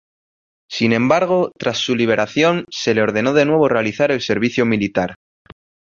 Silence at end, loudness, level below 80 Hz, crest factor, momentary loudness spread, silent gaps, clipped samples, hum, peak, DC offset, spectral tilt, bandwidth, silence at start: 0.85 s; -17 LUFS; -54 dBFS; 16 dB; 6 LU; none; under 0.1%; none; -2 dBFS; under 0.1%; -5.5 dB/octave; 7.4 kHz; 0.7 s